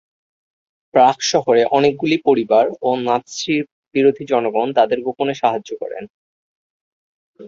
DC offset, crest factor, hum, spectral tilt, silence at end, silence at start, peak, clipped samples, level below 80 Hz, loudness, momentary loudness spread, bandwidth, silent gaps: under 0.1%; 18 dB; none; -4.5 dB/octave; 0 s; 0.95 s; 0 dBFS; under 0.1%; -62 dBFS; -17 LUFS; 9 LU; 7.6 kHz; 3.72-3.91 s, 6.10-7.34 s